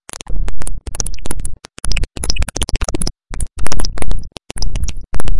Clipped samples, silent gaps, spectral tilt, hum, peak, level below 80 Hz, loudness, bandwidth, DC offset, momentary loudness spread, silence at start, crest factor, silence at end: 0.2%; none; -3.5 dB/octave; none; 0 dBFS; -22 dBFS; -24 LUFS; 12 kHz; under 0.1%; 8 LU; 0 s; 10 dB; 0 s